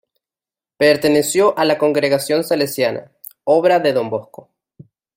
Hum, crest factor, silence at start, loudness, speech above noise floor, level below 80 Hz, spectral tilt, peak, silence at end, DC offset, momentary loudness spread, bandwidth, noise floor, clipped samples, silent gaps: none; 16 dB; 0.8 s; -16 LUFS; over 74 dB; -62 dBFS; -4 dB/octave; -2 dBFS; 0.95 s; under 0.1%; 9 LU; 16.5 kHz; under -90 dBFS; under 0.1%; none